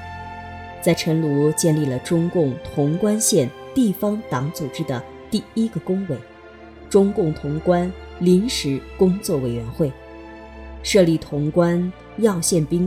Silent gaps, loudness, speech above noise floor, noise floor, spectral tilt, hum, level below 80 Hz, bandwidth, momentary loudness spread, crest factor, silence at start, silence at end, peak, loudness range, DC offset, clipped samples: none; -21 LUFS; 22 dB; -42 dBFS; -5.5 dB/octave; none; -44 dBFS; 17 kHz; 12 LU; 18 dB; 0 s; 0 s; -2 dBFS; 4 LU; under 0.1%; under 0.1%